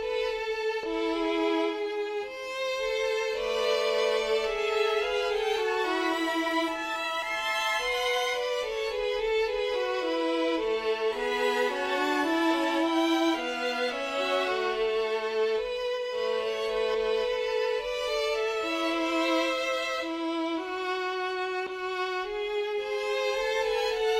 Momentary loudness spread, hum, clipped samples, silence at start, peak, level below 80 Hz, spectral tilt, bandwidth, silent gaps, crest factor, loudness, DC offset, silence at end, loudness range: 5 LU; none; under 0.1%; 0 s; -14 dBFS; -58 dBFS; -2 dB/octave; 16 kHz; none; 14 dB; -28 LUFS; under 0.1%; 0 s; 3 LU